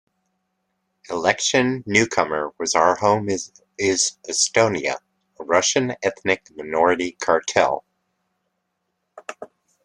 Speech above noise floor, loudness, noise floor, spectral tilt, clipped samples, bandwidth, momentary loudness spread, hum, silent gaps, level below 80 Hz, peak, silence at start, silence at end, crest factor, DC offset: 55 dB; -20 LUFS; -75 dBFS; -2.5 dB/octave; under 0.1%; 11.5 kHz; 13 LU; none; none; -62 dBFS; -2 dBFS; 1.1 s; 0.4 s; 20 dB; under 0.1%